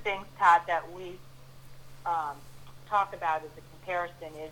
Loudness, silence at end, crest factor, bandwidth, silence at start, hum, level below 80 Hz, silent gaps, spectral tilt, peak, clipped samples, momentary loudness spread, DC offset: -29 LUFS; 0 s; 22 dB; 19 kHz; 0 s; none; -60 dBFS; none; -4 dB/octave; -10 dBFS; under 0.1%; 23 LU; under 0.1%